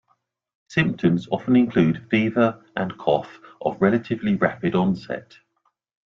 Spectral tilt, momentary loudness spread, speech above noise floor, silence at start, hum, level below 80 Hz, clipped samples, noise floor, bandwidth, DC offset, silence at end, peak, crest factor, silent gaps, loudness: -8 dB/octave; 10 LU; 49 dB; 0.7 s; none; -58 dBFS; under 0.1%; -71 dBFS; 7.2 kHz; under 0.1%; 0.85 s; -4 dBFS; 18 dB; none; -22 LUFS